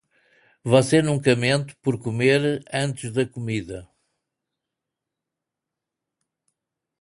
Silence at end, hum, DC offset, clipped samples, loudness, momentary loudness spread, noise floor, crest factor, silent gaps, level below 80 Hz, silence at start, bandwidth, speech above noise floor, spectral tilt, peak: 3.15 s; none; under 0.1%; under 0.1%; -22 LUFS; 11 LU; -85 dBFS; 22 dB; none; -58 dBFS; 0.65 s; 11.5 kHz; 64 dB; -5.5 dB/octave; -2 dBFS